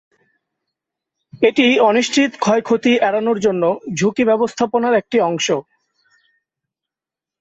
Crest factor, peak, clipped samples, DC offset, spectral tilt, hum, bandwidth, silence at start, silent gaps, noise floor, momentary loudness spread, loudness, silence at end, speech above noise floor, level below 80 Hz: 16 dB; -2 dBFS; under 0.1%; under 0.1%; -4.5 dB/octave; none; 8.2 kHz; 1.35 s; none; -88 dBFS; 6 LU; -16 LUFS; 1.8 s; 72 dB; -62 dBFS